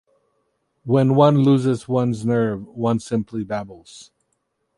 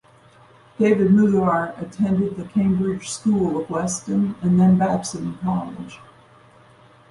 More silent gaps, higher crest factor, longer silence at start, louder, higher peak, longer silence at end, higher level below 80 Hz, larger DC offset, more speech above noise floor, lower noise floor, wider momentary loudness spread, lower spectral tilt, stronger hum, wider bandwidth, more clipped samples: neither; about the same, 18 dB vs 16 dB; about the same, 0.85 s vs 0.8 s; about the same, -20 LUFS vs -20 LUFS; first, -2 dBFS vs -6 dBFS; second, 0.75 s vs 1.15 s; second, -58 dBFS vs -52 dBFS; neither; first, 53 dB vs 31 dB; first, -72 dBFS vs -51 dBFS; first, 14 LU vs 11 LU; about the same, -8 dB/octave vs -7 dB/octave; neither; about the same, 11.5 kHz vs 11.5 kHz; neither